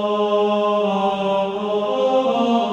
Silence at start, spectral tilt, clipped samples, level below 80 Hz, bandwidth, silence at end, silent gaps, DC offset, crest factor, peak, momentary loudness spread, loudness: 0 s; -6 dB/octave; under 0.1%; -62 dBFS; 8.6 kHz; 0 s; none; under 0.1%; 12 dB; -8 dBFS; 3 LU; -19 LUFS